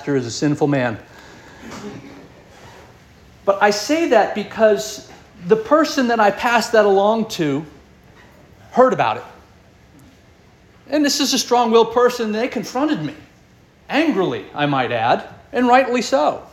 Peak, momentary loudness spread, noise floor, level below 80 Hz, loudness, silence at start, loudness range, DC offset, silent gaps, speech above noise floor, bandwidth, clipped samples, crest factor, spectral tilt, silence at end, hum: -2 dBFS; 14 LU; -50 dBFS; -54 dBFS; -17 LUFS; 0 s; 6 LU; under 0.1%; none; 33 dB; 16.5 kHz; under 0.1%; 18 dB; -4.5 dB/octave; 0.1 s; none